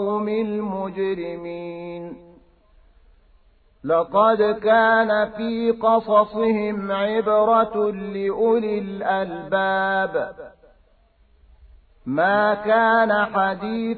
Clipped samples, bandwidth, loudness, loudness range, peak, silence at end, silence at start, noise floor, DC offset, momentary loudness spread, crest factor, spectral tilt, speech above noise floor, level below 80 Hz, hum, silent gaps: under 0.1%; 4.7 kHz; -20 LUFS; 9 LU; -4 dBFS; 0 s; 0 s; -57 dBFS; under 0.1%; 15 LU; 16 dB; -9.5 dB/octave; 37 dB; -56 dBFS; none; none